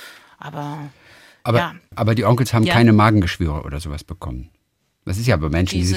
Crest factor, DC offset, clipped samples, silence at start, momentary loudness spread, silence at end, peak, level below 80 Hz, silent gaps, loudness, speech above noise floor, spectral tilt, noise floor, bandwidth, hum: 18 dB; under 0.1%; under 0.1%; 0 s; 20 LU; 0 s; -2 dBFS; -38 dBFS; none; -18 LUFS; 49 dB; -6.5 dB/octave; -67 dBFS; 15.5 kHz; none